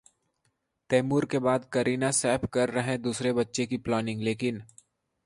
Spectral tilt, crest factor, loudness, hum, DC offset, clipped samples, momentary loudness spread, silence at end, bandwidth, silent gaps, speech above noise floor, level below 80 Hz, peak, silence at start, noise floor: -5 dB/octave; 18 dB; -28 LUFS; none; under 0.1%; under 0.1%; 5 LU; 0.6 s; 11.5 kHz; none; 48 dB; -60 dBFS; -10 dBFS; 0.9 s; -76 dBFS